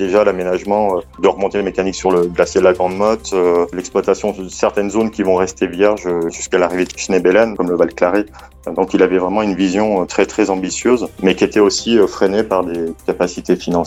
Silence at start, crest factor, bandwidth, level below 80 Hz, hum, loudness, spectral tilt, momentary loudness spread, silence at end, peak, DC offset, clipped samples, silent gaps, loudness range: 0 s; 14 dB; 14 kHz; -42 dBFS; none; -16 LUFS; -5 dB/octave; 6 LU; 0 s; 0 dBFS; under 0.1%; under 0.1%; none; 2 LU